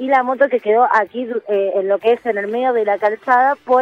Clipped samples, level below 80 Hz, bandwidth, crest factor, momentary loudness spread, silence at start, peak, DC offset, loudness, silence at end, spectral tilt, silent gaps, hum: under 0.1%; -70 dBFS; 7.2 kHz; 14 dB; 5 LU; 0 s; -2 dBFS; under 0.1%; -16 LUFS; 0 s; -6 dB/octave; none; none